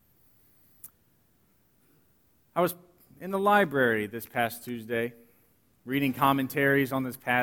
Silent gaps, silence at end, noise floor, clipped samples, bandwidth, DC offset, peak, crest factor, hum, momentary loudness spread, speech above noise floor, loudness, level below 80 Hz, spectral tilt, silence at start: none; 0 s; -67 dBFS; under 0.1%; over 20 kHz; under 0.1%; -8 dBFS; 20 dB; none; 22 LU; 40 dB; -27 LUFS; -68 dBFS; -5.5 dB/octave; 0.85 s